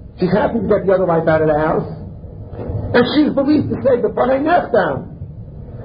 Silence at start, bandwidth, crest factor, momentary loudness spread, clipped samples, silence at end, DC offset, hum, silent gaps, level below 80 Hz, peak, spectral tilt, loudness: 0 s; 5.2 kHz; 16 dB; 18 LU; under 0.1%; 0 s; under 0.1%; none; none; -36 dBFS; -2 dBFS; -12 dB/octave; -16 LUFS